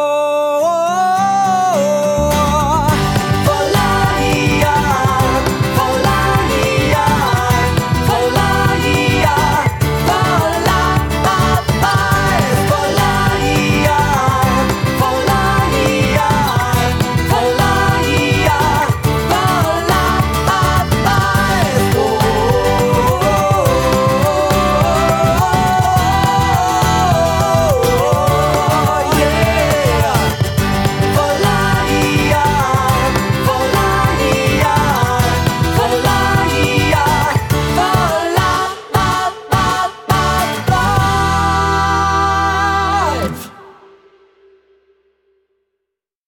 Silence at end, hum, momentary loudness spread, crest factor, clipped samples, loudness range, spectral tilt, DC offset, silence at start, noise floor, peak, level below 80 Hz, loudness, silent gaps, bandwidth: 2.55 s; none; 2 LU; 12 dB; under 0.1%; 2 LU; -5 dB/octave; under 0.1%; 0 s; -78 dBFS; 0 dBFS; -26 dBFS; -13 LUFS; none; 19 kHz